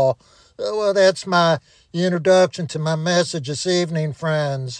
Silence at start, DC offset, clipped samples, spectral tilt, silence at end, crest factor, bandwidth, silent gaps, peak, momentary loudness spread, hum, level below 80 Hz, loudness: 0 s; under 0.1%; under 0.1%; -5 dB/octave; 0 s; 16 dB; 10 kHz; none; -4 dBFS; 9 LU; none; -62 dBFS; -19 LUFS